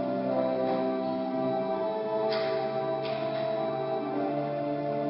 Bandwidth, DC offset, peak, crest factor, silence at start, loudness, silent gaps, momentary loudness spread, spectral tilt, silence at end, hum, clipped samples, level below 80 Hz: 5.8 kHz; under 0.1%; -16 dBFS; 14 dB; 0 s; -30 LUFS; none; 3 LU; -10.5 dB/octave; 0 s; none; under 0.1%; -70 dBFS